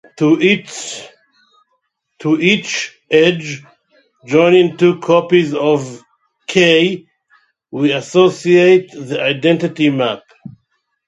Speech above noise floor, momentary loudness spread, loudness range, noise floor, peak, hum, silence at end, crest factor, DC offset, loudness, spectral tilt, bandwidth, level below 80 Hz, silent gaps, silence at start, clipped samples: 54 dB; 16 LU; 4 LU; -68 dBFS; 0 dBFS; none; 0.6 s; 16 dB; under 0.1%; -13 LUFS; -5 dB/octave; 10.5 kHz; -60 dBFS; none; 0.2 s; under 0.1%